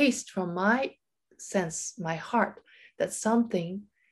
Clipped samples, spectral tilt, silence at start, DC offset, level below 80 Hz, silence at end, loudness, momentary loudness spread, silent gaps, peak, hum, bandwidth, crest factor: under 0.1%; -4.5 dB/octave; 0 s; under 0.1%; -70 dBFS; 0.3 s; -29 LUFS; 9 LU; none; -10 dBFS; none; 12.5 kHz; 18 dB